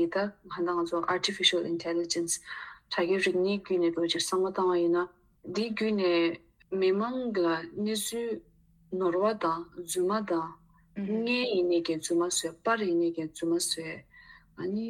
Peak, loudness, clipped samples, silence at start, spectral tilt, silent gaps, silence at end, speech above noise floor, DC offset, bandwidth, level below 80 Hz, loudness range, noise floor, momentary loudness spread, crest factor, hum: -10 dBFS; -29 LUFS; under 0.1%; 0 s; -3.5 dB/octave; none; 0 s; 26 dB; under 0.1%; 16 kHz; -68 dBFS; 3 LU; -55 dBFS; 10 LU; 20 dB; none